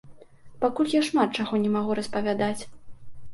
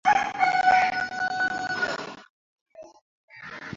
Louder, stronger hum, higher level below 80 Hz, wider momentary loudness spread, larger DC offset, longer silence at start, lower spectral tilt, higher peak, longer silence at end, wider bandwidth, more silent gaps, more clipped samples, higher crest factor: about the same, -26 LUFS vs -24 LUFS; neither; first, -58 dBFS vs -64 dBFS; second, 6 LU vs 20 LU; neither; about the same, 0.05 s vs 0.05 s; first, -5.5 dB/octave vs -2.5 dB/octave; about the same, -8 dBFS vs -6 dBFS; about the same, 0 s vs 0 s; first, 11.5 kHz vs 7.8 kHz; second, none vs 2.30-2.66 s, 3.02-3.28 s; neither; about the same, 18 dB vs 20 dB